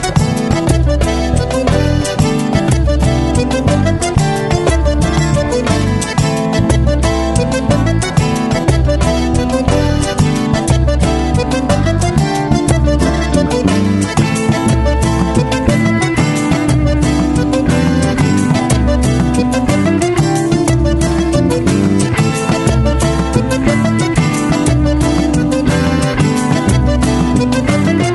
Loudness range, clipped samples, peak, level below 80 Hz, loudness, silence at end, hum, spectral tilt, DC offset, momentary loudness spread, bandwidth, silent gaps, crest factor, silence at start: 1 LU; under 0.1%; 0 dBFS; -20 dBFS; -13 LUFS; 0 s; none; -6 dB/octave; under 0.1%; 2 LU; 12 kHz; none; 12 dB; 0 s